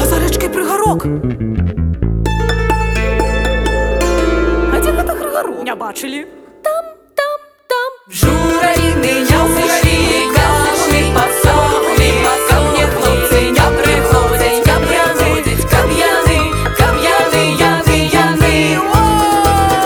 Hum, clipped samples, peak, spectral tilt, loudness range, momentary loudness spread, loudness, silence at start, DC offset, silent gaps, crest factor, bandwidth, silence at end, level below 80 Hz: none; under 0.1%; 0 dBFS; -4.5 dB/octave; 6 LU; 8 LU; -13 LUFS; 0 s; under 0.1%; none; 12 dB; over 20 kHz; 0 s; -20 dBFS